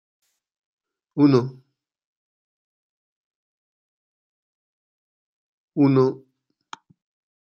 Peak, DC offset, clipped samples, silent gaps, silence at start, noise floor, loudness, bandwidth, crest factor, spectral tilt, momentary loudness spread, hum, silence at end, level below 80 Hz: -4 dBFS; under 0.1%; under 0.1%; 2.05-5.68 s; 1.15 s; -46 dBFS; -19 LUFS; 7.2 kHz; 22 dB; -9 dB/octave; 16 LU; none; 1.25 s; -72 dBFS